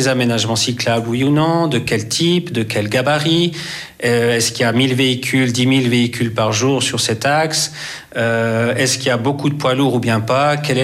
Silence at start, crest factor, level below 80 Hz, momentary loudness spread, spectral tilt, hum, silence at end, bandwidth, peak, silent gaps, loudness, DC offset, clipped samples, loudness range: 0 s; 12 dB; -54 dBFS; 4 LU; -4.5 dB/octave; none; 0 s; 15.5 kHz; -4 dBFS; none; -16 LUFS; under 0.1%; under 0.1%; 1 LU